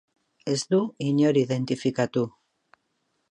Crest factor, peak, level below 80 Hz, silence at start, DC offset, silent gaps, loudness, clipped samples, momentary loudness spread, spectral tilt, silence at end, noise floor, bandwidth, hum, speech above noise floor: 16 dB; -10 dBFS; -72 dBFS; 0.45 s; under 0.1%; none; -25 LUFS; under 0.1%; 8 LU; -6 dB/octave; 1 s; -74 dBFS; 10.5 kHz; none; 51 dB